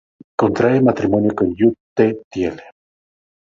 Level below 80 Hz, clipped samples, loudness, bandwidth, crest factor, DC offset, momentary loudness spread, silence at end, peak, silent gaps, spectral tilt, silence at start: -48 dBFS; under 0.1%; -17 LUFS; 7.4 kHz; 16 dB; under 0.1%; 9 LU; 0.9 s; -2 dBFS; 1.80-1.96 s, 2.24-2.31 s; -8.5 dB/octave; 0.4 s